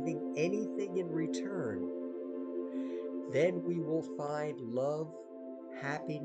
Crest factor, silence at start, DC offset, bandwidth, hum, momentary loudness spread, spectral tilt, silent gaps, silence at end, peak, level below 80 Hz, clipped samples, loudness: 18 dB; 0 s; under 0.1%; 8.8 kHz; none; 9 LU; -6.5 dB/octave; none; 0 s; -18 dBFS; -82 dBFS; under 0.1%; -37 LUFS